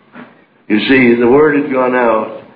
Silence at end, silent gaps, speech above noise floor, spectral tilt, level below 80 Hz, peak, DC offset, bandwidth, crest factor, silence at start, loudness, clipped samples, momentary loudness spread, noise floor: 0.15 s; none; 28 dB; -9 dB/octave; -46 dBFS; 0 dBFS; under 0.1%; 5 kHz; 12 dB; 0.15 s; -11 LUFS; under 0.1%; 7 LU; -38 dBFS